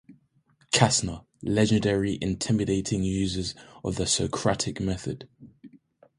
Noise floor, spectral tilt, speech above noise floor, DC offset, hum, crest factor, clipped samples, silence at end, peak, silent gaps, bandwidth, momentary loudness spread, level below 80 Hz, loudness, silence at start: -65 dBFS; -4.5 dB/octave; 39 dB; under 0.1%; none; 24 dB; under 0.1%; 0.45 s; -2 dBFS; none; 11.5 kHz; 13 LU; -46 dBFS; -26 LUFS; 0.1 s